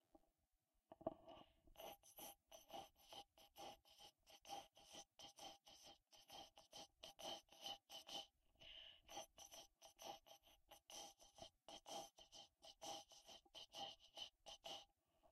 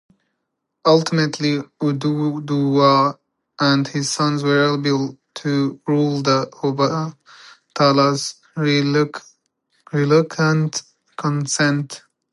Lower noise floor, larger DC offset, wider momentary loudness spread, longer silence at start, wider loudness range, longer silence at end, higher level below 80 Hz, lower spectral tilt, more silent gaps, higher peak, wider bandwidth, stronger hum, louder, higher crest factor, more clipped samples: first, -89 dBFS vs -76 dBFS; neither; about the same, 11 LU vs 11 LU; second, 0.15 s vs 0.85 s; about the same, 4 LU vs 2 LU; second, 0 s vs 0.35 s; second, -84 dBFS vs -68 dBFS; second, -1.5 dB/octave vs -5.5 dB/octave; neither; second, -32 dBFS vs 0 dBFS; first, 15.5 kHz vs 11.5 kHz; neither; second, -59 LUFS vs -19 LUFS; first, 30 dB vs 18 dB; neither